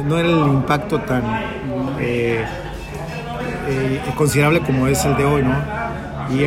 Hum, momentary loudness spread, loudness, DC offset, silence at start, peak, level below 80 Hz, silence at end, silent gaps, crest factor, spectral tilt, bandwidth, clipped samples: none; 11 LU; -19 LUFS; under 0.1%; 0 s; -4 dBFS; -36 dBFS; 0 s; none; 16 dB; -6 dB/octave; 16 kHz; under 0.1%